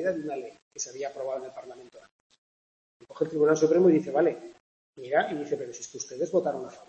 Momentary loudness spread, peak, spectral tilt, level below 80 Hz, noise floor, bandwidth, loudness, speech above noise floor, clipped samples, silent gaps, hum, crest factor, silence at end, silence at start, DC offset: 21 LU; -10 dBFS; -5.5 dB/octave; -76 dBFS; under -90 dBFS; 8.4 kHz; -27 LUFS; over 62 dB; under 0.1%; 0.62-0.71 s, 2.11-2.30 s, 2.38-3.00 s, 4.60-4.93 s; none; 18 dB; 0.05 s; 0 s; under 0.1%